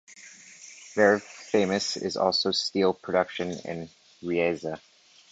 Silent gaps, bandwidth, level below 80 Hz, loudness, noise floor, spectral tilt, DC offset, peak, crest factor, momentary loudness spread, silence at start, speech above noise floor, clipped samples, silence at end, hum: none; 9.2 kHz; -64 dBFS; -26 LUFS; -49 dBFS; -4 dB/octave; under 0.1%; -8 dBFS; 20 dB; 22 LU; 0.1 s; 23 dB; under 0.1%; 0.55 s; none